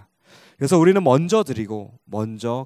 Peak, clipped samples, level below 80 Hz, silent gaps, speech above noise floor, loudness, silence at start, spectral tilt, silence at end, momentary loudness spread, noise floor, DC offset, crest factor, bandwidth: -2 dBFS; under 0.1%; -56 dBFS; none; 33 dB; -19 LUFS; 0.6 s; -6.5 dB/octave; 0 s; 16 LU; -52 dBFS; under 0.1%; 18 dB; 15 kHz